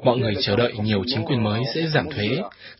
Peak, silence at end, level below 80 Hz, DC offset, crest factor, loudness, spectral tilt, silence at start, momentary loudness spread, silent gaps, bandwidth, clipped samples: -4 dBFS; 0.05 s; -48 dBFS; under 0.1%; 18 dB; -22 LUFS; -9.5 dB/octave; 0 s; 4 LU; none; 5.8 kHz; under 0.1%